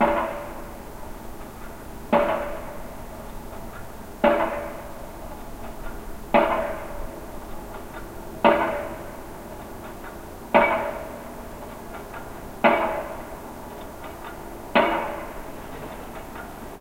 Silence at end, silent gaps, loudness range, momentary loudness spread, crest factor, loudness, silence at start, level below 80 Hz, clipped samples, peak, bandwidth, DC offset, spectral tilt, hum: 0 s; none; 4 LU; 18 LU; 24 dB; -25 LUFS; 0 s; -42 dBFS; under 0.1%; -2 dBFS; 16 kHz; under 0.1%; -5 dB/octave; none